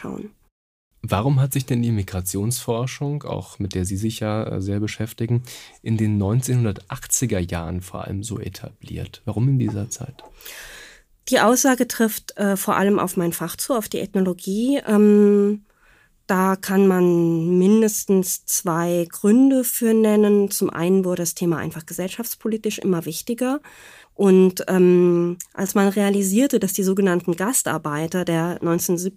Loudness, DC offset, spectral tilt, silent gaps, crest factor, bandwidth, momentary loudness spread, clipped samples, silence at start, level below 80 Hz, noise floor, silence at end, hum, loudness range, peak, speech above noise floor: -20 LUFS; under 0.1%; -5.5 dB/octave; 0.52-0.91 s; 16 dB; 15.5 kHz; 14 LU; under 0.1%; 0 s; -52 dBFS; -56 dBFS; 0.05 s; none; 7 LU; -4 dBFS; 36 dB